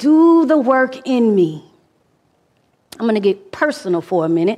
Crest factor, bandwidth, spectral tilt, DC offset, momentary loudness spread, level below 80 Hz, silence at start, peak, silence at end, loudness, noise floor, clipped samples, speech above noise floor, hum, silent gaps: 14 dB; 12 kHz; -7 dB/octave; under 0.1%; 9 LU; -66 dBFS; 0 s; -2 dBFS; 0 s; -16 LUFS; -60 dBFS; under 0.1%; 46 dB; none; none